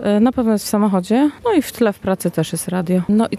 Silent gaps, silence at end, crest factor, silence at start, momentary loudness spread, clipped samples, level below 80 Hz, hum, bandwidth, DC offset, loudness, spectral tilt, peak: none; 0 s; 12 dB; 0 s; 5 LU; under 0.1%; -48 dBFS; none; 14.5 kHz; under 0.1%; -17 LUFS; -6 dB/octave; -4 dBFS